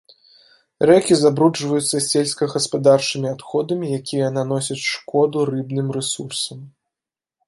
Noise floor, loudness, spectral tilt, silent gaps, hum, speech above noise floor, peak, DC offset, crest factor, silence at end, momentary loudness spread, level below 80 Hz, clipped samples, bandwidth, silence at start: -89 dBFS; -19 LUFS; -4.5 dB/octave; none; none; 70 dB; -2 dBFS; under 0.1%; 18 dB; 0.8 s; 9 LU; -64 dBFS; under 0.1%; 12 kHz; 0.8 s